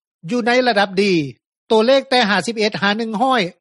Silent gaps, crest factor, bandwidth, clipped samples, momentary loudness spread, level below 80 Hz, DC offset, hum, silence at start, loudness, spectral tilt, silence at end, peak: 1.46-1.67 s; 14 dB; 11.5 kHz; under 0.1%; 6 LU; -64 dBFS; under 0.1%; none; 0.25 s; -16 LUFS; -4.5 dB/octave; 0.1 s; -2 dBFS